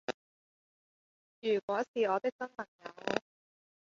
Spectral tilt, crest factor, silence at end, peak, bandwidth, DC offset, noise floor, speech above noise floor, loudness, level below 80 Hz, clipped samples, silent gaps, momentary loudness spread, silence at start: -2.5 dB/octave; 26 dB; 0.8 s; -12 dBFS; 7.4 kHz; under 0.1%; under -90 dBFS; over 56 dB; -35 LUFS; -80 dBFS; under 0.1%; 0.14-1.42 s, 1.63-1.68 s, 1.88-1.94 s, 2.32-2.39 s, 2.68-2.79 s; 13 LU; 0.1 s